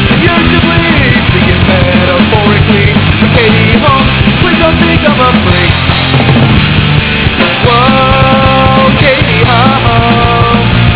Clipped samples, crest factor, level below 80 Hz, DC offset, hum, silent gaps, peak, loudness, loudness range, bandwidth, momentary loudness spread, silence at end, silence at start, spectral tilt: 4%; 6 dB; -18 dBFS; 0.4%; none; none; 0 dBFS; -6 LUFS; 1 LU; 4 kHz; 2 LU; 0 s; 0 s; -10 dB/octave